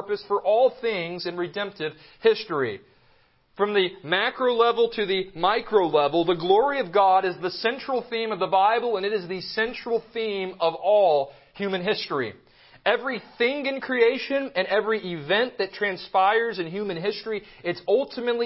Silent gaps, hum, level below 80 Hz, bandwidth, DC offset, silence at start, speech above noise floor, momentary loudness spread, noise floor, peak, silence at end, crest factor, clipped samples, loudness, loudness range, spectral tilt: none; none; -66 dBFS; 5.8 kHz; under 0.1%; 0 s; 37 dB; 9 LU; -61 dBFS; -6 dBFS; 0 s; 18 dB; under 0.1%; -24 LUFS; 4 LU; -8.5 dB/octave